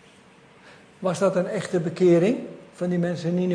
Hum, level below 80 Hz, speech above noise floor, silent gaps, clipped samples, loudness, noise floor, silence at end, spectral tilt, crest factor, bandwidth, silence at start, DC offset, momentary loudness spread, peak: none; -66 dBFS; 30 dB; none; under 0.1%; -23 LUFS; -52 dBFS; 0 s; -7 dB/octave; 16 dB; 10.5 kHz; 0.65 s; under 0.1%; 12 LU; -8 dBFS